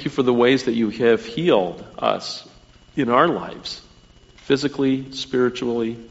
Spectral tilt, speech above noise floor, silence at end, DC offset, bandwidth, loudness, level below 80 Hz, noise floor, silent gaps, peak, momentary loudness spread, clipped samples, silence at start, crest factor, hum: -4 dB/octave; 30 dB; 0.05 s; under 0.1%; 8 kHz; -21 LUFS; -54 dBFS; -50 dBFS; none; -2 dBFS; 14 LU; under 0.1%; 0 s; 20 dB; none